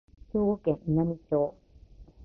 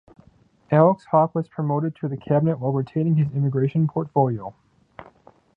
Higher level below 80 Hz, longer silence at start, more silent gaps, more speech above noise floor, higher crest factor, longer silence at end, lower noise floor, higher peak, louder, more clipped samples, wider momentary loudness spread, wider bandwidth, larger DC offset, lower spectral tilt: first, -52 dBFS vs -60 dBFS; second, 0.35 s vs 0.7 s; neither; second, 25 dB vs 36 dB; about the same, 16 dB vs 20 dB; second, 0 s vs 0.55 s; second, -52 dBFS vs -56 dBFS; second, -14 dBFS vs -2 dBFS; second, -29 LUFS vs -22 LUFS; neither; second, 5 LU vs 9 LU; second, 3.4 kHz vs 4.2 kHz; neither; about the same, -12.5 dB/octave vs -11.5 dB/octave